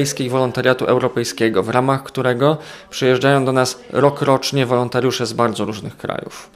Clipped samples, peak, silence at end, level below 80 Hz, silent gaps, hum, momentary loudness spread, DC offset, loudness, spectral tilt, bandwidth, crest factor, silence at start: under 0.1%; 0 dBFS; 0.1 s; -56 dBFS; none; none; 10 LU; under 0.1%; -18 LUFS; -5 dB/octave; 15.5 kHz; 18 dB; 0 s